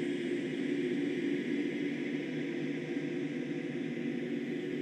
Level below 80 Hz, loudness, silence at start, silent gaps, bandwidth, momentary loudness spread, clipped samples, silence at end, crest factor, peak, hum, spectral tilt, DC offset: -86 dBFS; -36 LUFS; 0 s; none; 9.2 kHz; 3 LU; under 0.1%; 0 s; 12 dB; -22 dBFS; none; -6.5 dB/octave; under 0.1%